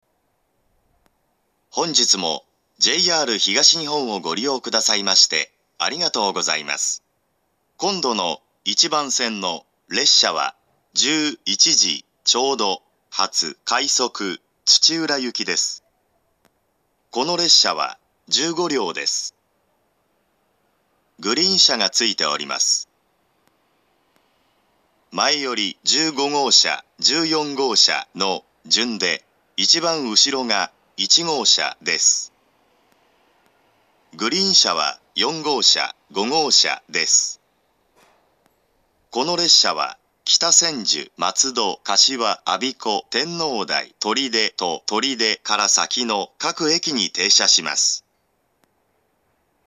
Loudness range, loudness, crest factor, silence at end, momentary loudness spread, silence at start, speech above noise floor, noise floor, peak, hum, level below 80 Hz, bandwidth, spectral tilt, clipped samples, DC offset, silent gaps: 4 LU; -17 LUFS; 22 dB; 1.65 s; 12 LU; 1.75 s; 50 dB; -69 dBFS; 0 dBFS; none; -78 dBFS; 14 kHz; -0.5 dB/octave; under 0.1%; under 0.1%; none